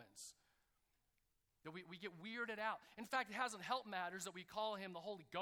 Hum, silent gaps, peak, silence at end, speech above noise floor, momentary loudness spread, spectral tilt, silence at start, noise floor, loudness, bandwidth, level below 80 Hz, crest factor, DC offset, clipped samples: none; none; -28 dBFS; 0 s; 38 dB; 13 LU; -3 dB/octave; 0 s; -85 dBFS; -47 LUFS; 19 kHz; -86 dBFS; 22 dB; under 0.1%; under 0.1%